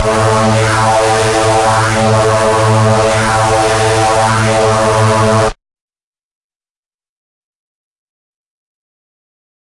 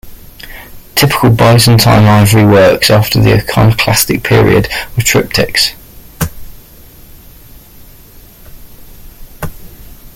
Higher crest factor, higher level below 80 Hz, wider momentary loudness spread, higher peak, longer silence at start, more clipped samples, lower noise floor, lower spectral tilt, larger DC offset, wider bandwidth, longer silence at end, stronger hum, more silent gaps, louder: about the same, 12 dB vs 10 dB; about the same, -34 dBFS vs -30 dBFS; second, 1 LU vs 19 LU; about the same, -2 dBFS vs 0 dBFS; about the same, 0 s vs 0.05 s; neither; first, under -90 dBFS vs -36 dBFS; about the same, -4.5 dB/octave vs -5 dB/octave; neither; second, 11.5 kHz vs 17.5 kHz; first, 4.1 s vs 0.1 s; neither; neither; about the same, -10 LUFS vs -8 LUFS